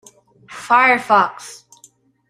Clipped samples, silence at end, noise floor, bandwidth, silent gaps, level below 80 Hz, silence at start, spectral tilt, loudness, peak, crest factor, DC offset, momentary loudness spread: under 0.1%; 0.75 s; -52 dBFS; 14.5 kHz; none; -66 dBFS; 0.5 s; -3 dB/octave; -14 LUFS; -2 dBFS; 18 dB; under 0.1%; 23 LU